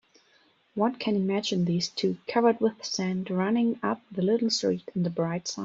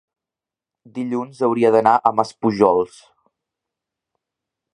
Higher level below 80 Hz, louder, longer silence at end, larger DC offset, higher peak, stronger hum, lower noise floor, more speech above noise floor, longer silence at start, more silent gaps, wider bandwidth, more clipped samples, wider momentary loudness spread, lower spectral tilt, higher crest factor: second, -70 dBFS vs -62 dBFS; second, -27 LUFS vs -18 LUFS; second, 0 s vs 1.85 s; neither; second, -8 dBFS vs 0 dBFS; neither; second, -64 dBFS vs -88 dBFS; second, 37 dB vs 71 dB; second, 0.75 s vs 0.95 s; neither; second, 7.8 kHz vs 10.5 kHz; neither; second, 6 LU vs 13 LU; second, -5.5 dB/octave vs -7 dB/octave; about the same, 18 dB vs 20 dB